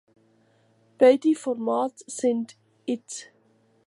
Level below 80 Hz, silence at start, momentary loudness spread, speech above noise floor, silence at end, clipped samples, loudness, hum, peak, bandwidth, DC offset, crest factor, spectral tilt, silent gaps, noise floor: -82 dBFS; 1 s; 19 LU; 40 dB; 0.65 s; under 0.1%; -24 LUFS; none; -6 dBFS; 11.5 kHz; under 0.1%; 20 dB; -4 dB/octave; none; -63 dBFS